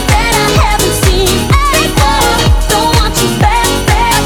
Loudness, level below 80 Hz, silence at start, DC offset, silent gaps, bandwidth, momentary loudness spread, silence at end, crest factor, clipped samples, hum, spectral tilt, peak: -10 LUFS; -16 dBFS; 0 s; under 0.1%; none; 19.5 kHz; 1 LU; 0 s; 10 dB; under 0.1%; none; -4 dB/octave; 0 dBFS